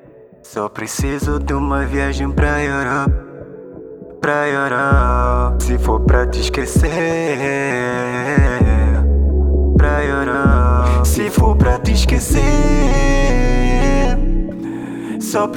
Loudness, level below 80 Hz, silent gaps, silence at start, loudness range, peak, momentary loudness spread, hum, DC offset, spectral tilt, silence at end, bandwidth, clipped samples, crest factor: -16 LUFS; -18 dBFS; none; 0.5 s; 4 LU; 0 dBFS; 10 LU; none; under 0.1%; -6 dB/octave; 0 s; 16.5 kHz; under 0.1%; 14 dB